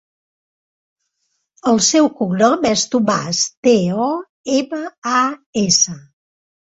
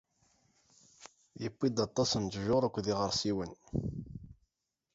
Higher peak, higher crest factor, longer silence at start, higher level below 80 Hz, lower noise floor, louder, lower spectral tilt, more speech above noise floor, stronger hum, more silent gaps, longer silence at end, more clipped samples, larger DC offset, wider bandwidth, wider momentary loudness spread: first, -2 dBFS vs -16 dBFS; about the same, 16 dB vs 20 dB; first, 1.65 s vs 1 s; about the same, -56 dBFS vs -56 dBFS; second, -71 dBFS vs -85 dBFS; first, -16 LUFS vs -34 LUFS; second, -3.5 dB/octave vs -5 dB/octave; about the same, 55 dB vs 53 dB; neither; first, 3.57-3.63 s, 4.29-4.44 s, 4.98-5.02 s, 5.46-5.53 s vs none; about the same, 0.7 s vs 0.6 s; neither; neither; about the same, 8.4 kHz vs 8 kHz; second, 9 LU vs 20 LU